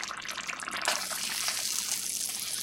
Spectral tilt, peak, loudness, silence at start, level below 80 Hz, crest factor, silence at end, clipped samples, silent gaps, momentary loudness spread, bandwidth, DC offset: 1.5 dB/octave; -8 dBFS; -30 LUFS; 0 s; -68 dBFS; 26 dB; 0 s; under 0.1%; none; 6 LU; 17 kHz; under 0.1%